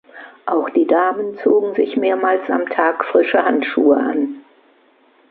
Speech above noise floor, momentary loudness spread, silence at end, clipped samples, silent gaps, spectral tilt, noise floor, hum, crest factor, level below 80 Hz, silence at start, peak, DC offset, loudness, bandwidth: 38 dB; 6 LU; 0.9 s; under 0.1%; none; -8.5 dB/octave; -54 dBFS; none; 16 dB; -68 dBFS; 0.15 s; 0 dBFS; under 0.1%; -17 LUFS; 4.6 kHz